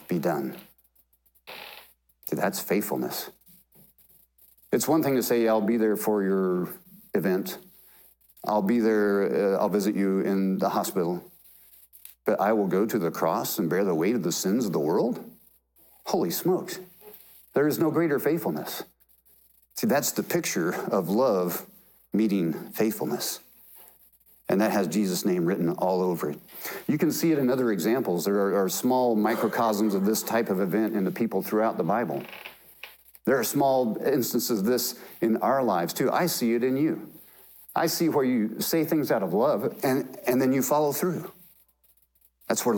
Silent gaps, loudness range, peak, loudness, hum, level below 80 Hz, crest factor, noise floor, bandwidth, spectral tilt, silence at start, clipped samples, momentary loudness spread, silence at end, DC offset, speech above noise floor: none; 4 LU; -12 dBFS; -26 LUFS; none; -72 dBFS; 14 dB; -65 dBFS; 18 kHz; -5 dB/octave; 0 s; under 0.1%; 12 LU; 0 s; under 0.1%; 40 dB